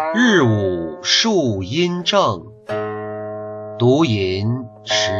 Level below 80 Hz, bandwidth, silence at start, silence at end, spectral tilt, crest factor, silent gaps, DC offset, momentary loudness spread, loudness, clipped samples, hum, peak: -54 dBFS; 7.8 kHz; 0 s; 0 s; -4.5 dB/octave; 16 dB; none; under 0.1%; 14 LU; -18 LUFS; under 0.1%; none; -2 dBFS